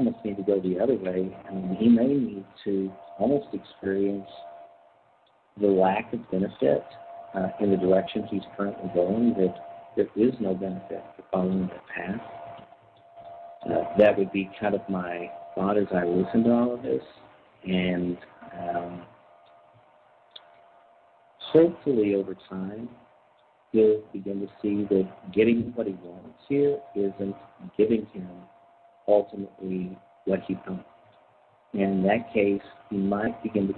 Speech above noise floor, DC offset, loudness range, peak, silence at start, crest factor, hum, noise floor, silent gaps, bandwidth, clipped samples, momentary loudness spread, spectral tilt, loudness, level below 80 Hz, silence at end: 37 dB; under 0.1%; 5 LU; -6 dBFS; 0 s; 20 dB; none; -62 dBFS; none; 4.4 kHz; under 0.1%; 17 LU; -10.5 dB/octave; -26 LUFS; -62 dBFS; 0 s